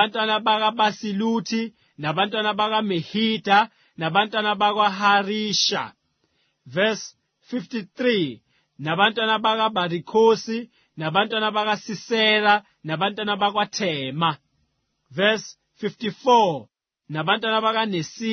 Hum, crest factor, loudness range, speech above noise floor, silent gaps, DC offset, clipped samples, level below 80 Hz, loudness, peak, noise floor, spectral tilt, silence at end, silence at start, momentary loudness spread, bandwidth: none; 20 dB; 4 LU; 49 dB; none; under 0.1%; under 0.1%; -70 dBFS; -22 LUFS; -2 dBFS; -71 dBFS; -4 dB/octave; 0 s; 0 s; 13 LU; 6.6 kHz